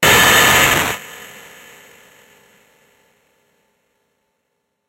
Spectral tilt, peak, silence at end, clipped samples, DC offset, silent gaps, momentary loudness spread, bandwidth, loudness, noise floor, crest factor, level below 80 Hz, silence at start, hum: -1.5 dB/octave; 0 dBFS; 3.65 s; under 0.1%; under 0.1%; none; 26 LU; 16 kHz; -11 LUFS; -71 dBFS; 18 dB; -44 dBFS; 0 s; none